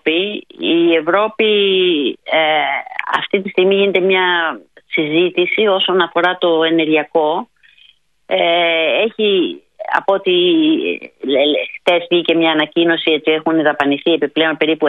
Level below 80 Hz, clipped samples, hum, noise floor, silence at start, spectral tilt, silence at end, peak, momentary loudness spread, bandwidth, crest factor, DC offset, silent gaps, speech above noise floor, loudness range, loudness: -68 dBFS; under 0.1%; none; -51 dBFS; 0.05 s; -6.5 dB/octave; 0 s; 0 dBFS; 6 LU; 4.5 kHz; 14 dB; under 0.1%; none; 36 dB; 1 LU; -15 LUFS